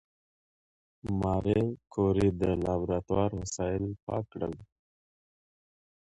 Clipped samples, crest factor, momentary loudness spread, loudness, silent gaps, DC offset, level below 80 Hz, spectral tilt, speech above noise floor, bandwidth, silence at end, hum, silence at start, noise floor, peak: under 0.1%; 18 dB; 10 LU; -31 LUFS; 4.03-4.07 s; under 0.1%; -48 dBFS; -7 dB/octave; over 60 dB; 11 kHz; 1.4 s; none; 1.05 s; under -90 dBFS; -14 dBFS